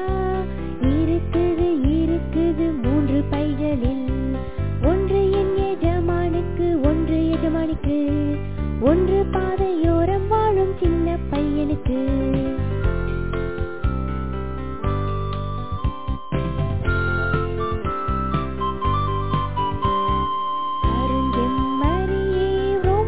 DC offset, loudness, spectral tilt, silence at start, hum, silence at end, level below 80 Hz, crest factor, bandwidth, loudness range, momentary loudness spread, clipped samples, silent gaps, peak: 2%; -22 LUFS; -12 dB/octave; 0 s; none; 0 s; -28 dBFS; 16 dB; 4 kHz; 5 LU; 7 LU; under 0.1%; none; -4 dBFS